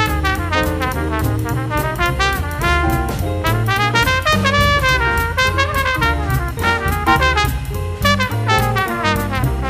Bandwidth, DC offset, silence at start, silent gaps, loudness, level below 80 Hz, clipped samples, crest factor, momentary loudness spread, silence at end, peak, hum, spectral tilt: 15.5 kHz; under 0.1%; 0 s; none; -16 LUFS; -24 dBFS; under 0.1%; 16 dB; 6 LU; 0 s; 0 dBFS; none; -5 dB/octave